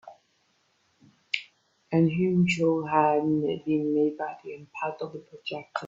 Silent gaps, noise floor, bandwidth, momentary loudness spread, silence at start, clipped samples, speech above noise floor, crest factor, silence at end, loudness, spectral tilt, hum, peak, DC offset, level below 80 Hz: none; -70 dBFS; 7.8 kHz; 14 LU; 0.05 s; under 0.1%; 43 dB; 20 dB; 0 s; -27 LUFS; -7 dB/octave; none; -6 dBFS; under 0.1%; -68 dBFS